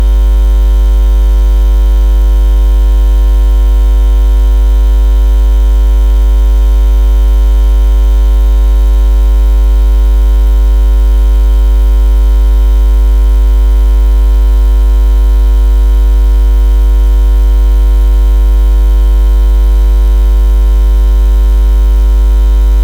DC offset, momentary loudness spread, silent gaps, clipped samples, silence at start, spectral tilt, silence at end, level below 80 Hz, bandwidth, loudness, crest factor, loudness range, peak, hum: 0.6%; 0 LU; none; under 0.1%; 0 s; -7 dB/octave; 0 s; -6 dBFS; 4.2 kHz; -10 LUFS; 4 dB; 0 LU; 0 dBFS; 50 Hz at -5 dBFS